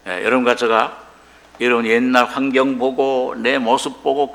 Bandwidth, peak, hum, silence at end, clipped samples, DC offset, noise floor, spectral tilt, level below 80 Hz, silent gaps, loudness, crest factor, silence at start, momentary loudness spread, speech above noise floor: 14.5 kHz; 0 dBFS; none; 0 s; under 0.1%; under 0.1%; -46 dBFS; -4 dB/octave; -58 dBFS; none; -17 LUFS; 18 dB; 0.05 s; 4 LU; 29 dB